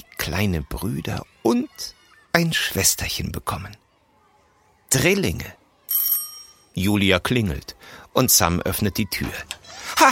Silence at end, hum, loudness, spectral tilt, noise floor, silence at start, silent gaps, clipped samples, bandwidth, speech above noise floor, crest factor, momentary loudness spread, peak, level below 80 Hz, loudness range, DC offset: 0 s; none; -21 LUFS; -3.5 dB/octave; -60 dBFS; 0.2 s; none; under 0.1%; 17 kHz; 38 dB; 22 dB; 17 LU; 0 dBFS; -42 dBFS; 3 LU; under 0.1%